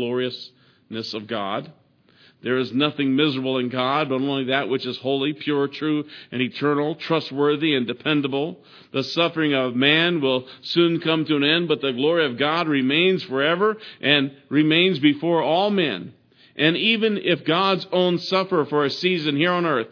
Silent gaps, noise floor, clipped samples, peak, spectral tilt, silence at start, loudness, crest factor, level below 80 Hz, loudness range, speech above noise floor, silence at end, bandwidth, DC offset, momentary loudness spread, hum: none; -55 dBFS; under 0.1%; -2 dBFS; -6.5 dB/octave; 0 s; -21 LUFS; 20 dB; -74 dBFS; 4 LU; 34 dB; 0.05 s; 5.4 kHz; under 0.1%; 9 LU; none